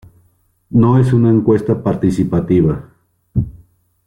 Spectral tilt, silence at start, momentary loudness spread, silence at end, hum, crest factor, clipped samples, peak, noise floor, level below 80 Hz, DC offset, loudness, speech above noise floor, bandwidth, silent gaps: -10 dB/octave; 0.7 s; 10 LU; 0.5 s; none; 12 dB; under 0.1%; -2 dBFS; -57 dBFS; -38 dBFS; under 0.1%; -14 LUFS; 45 dB; 10.5 kHz; none